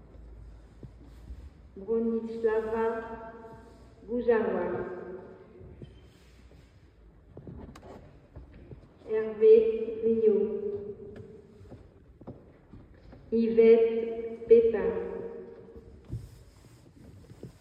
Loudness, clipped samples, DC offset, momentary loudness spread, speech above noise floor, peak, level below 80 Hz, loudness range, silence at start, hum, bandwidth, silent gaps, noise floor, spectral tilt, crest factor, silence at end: -27 LUFS; under 0.1%; under 0.1%; 28 LU; 31 dB; -8 dBFS; -54 dBFS; 10 LU; 0.15 s; none; 4.9 kHz; none; -56 dBFS; -8.5 dB/octave; 22 dB; 0.15 s